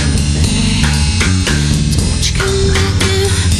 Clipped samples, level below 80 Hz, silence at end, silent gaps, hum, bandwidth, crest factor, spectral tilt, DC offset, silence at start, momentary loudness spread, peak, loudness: under 0.1%; -18 dBFS; 0 s; none; none; 13.5 kHz; 12 dB; -4.5 dB/octave; under 0.1%; 0 s; 1 LU; 0 dBFS; -13 LUFS